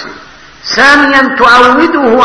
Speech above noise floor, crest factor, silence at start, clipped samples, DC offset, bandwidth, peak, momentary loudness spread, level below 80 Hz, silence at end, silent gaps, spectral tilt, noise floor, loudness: 27 dB; 6 dB; 0 s; 5%; under 0.1%; 11 kHz; 0 dBFS; 14 LU; -38 dBFS; 0 s; none; -3 dB/octave; -33 dBFS; -5 LUFS